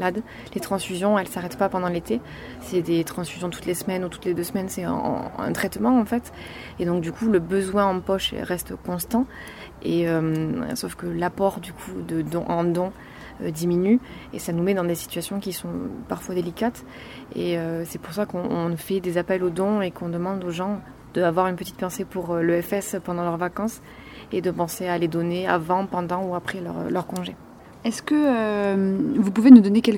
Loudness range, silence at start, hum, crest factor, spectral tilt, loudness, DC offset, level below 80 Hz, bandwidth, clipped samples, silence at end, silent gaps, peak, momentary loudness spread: 3 LU; 0 s; none; 24 dB; -6 dB/octave; -24 LUFS; under 0.1%; -52 dBFS; 17 kHz; under 0.1%; 0 s; none; 0 dBFS; 11 LU